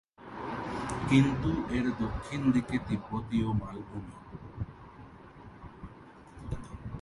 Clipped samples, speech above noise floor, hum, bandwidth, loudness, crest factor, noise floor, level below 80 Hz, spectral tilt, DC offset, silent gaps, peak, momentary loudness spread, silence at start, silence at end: under 0.1%; 22 dB; none; 11.5 kHz; -32 LUFS; 22 dB; -52 dBFS; -48 dBFS; -7 dB/octave; under 0.1%; none; -12 dBFS; 23 LU; 0.2 s; 0 s